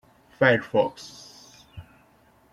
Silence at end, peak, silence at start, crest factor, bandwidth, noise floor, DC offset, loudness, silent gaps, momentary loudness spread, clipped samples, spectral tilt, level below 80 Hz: 0.7 s; -4 dBFS; 0.4 s; 24 dB; 13 kHz; -59 dBFS; under 0.1%; -23 LUFS; none; 26 LU; under 0.1%; -5.5 dB/octave; -60 dBFS